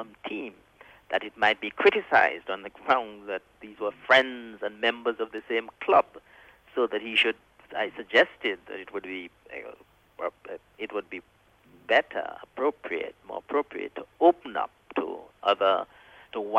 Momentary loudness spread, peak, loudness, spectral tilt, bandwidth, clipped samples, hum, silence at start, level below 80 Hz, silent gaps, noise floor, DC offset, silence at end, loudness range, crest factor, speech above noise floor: 16 LU; -8 dBFS; -27 LUFS; -4 dB/octave; 9.6 kHz; under 0.1%; none; 0 s; -70 dBFS; none; -58 dBFS; under 0.1%; 0 s; 6 LU; 20 dB; 31 dB